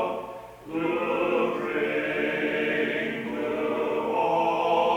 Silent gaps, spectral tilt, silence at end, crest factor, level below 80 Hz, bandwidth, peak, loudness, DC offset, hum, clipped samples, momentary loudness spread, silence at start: none; -6 dB/octave; 0 s; 14 dB; -62 dBFS; 19.5 kHz; -12 dBFS; -26 LUFS; under 0.1%; none; under 0.1%; 7 LU; 0 s